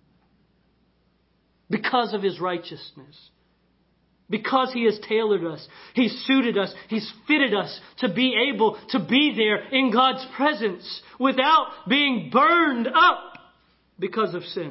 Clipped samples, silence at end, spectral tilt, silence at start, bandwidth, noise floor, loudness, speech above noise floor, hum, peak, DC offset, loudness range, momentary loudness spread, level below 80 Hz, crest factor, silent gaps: under 0.1%; 0 s; -9 dB/octave; 1.7 s; 5.8 kHz; -66 dBFS; -22 LUFS; 43 dB; none; -4 dBFS; under 0.1%; 9 LU; 13 LU; -70 dBFS; 20 dB; none